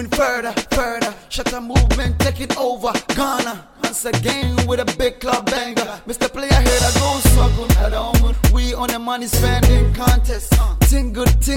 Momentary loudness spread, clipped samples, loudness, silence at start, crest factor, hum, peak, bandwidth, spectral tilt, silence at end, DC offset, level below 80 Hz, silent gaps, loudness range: 8 LU; under 0.1%; -18 LUFS; 0 s; 16 dB; none; 0 dBFS; 17 kHz; -4.5 dB/octave; 0 s; under 0.1%; -20 dBFS; none; 4 LU